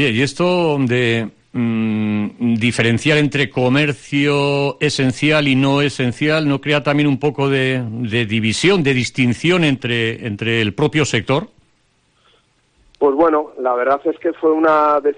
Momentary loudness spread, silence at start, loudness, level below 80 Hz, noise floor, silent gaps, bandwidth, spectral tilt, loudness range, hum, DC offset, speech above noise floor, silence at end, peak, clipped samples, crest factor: 6 LU; 0 s; -16 LUFS; -52 dBFS; -60 dBFS; none; 10 kHz; -5.5 dB/octave; 4 LU; none; under 0.1%; 44 dB; 0.05 s; -4 dBFS; under 0.1%; 14 dB